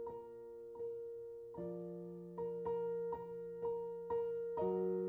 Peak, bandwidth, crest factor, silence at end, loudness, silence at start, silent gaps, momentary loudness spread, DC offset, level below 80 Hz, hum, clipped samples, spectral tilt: -28 dBFS; 3.3 kHz; 14 dB; 0 s; -44 LUFS; 0 s; none; 11 LU; under 0.1%; -74 dBFS; none; under 0.1%; -10 dB/octave